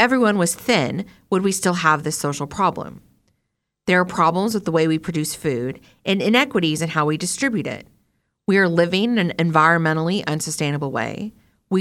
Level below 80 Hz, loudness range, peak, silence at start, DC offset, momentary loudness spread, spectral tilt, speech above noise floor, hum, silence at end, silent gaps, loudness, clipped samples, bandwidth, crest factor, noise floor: -58 dBFS; 3 LU; -2 dBFS; 0 s; under 0.1%; 12 LU; -4.5 dB/octave; 56 dB; none; 0 s; none; -20 LUFS; under 0.1%; 16.5 kHz; 18 dB; -76 dBFS